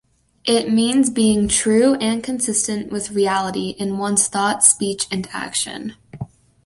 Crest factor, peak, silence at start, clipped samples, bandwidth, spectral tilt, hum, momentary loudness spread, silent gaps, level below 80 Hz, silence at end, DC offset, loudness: 20 dB; 0 dBFS; 0.45 s; under 0.1%; 11.5 kHz; -3 dB/octave; none; 13 LU; none; -48 dBFS; 0.4 s; under 0.1%; -18 LUFS